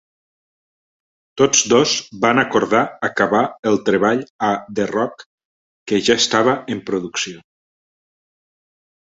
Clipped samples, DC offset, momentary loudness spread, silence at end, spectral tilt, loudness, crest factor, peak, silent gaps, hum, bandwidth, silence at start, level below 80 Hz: under 0.1%; under 0.1%; 9 LU; 1.8 s; -3 dB/octave; -17 LUFS; 18 dB; -2 dBFS; 3.59-3.63 s, 4.30-4.39 s, 5.26-5.38 s, 5.45-5.86 s; none; 8 kHz; 1.35 s; -58 dBFS